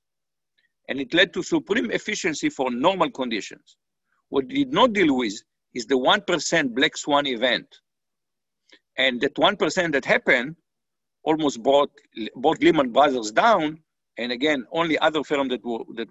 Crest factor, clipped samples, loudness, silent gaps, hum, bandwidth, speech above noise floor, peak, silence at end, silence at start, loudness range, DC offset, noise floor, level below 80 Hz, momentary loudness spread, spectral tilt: 20 dB; under 0.1%; -22 LUFS; none; none; 8.4 kHz; 66 dB; -4 dBFS; 0.05 s; 0.9 s; 3 LU; under 0.1%; -88 dBFS; -62 dBFS; 12 LU; -3.5 dB/octave